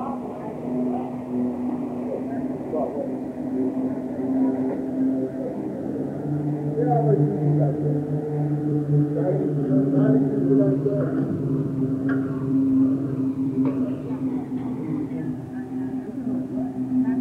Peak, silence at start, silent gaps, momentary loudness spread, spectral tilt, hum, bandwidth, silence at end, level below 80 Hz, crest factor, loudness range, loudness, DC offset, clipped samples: -8 dBFS; 0 s; none; 9 LU; -11 dB/octave; none; 3.4 kHz; 0 s; -58 dBFS; 16 dB; 6 LU; -24 LUFS; under 0.1%; under 0.1%